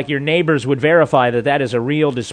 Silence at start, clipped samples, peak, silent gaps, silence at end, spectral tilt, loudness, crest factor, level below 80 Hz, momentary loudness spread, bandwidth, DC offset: 0 s; under 0.1%; 0 dBFS; none; 0 s; -6.5 dB/octave; -15 LUFS; 16 dB; -54 dBFS; 5 LU; 10 kHz; under 0.1%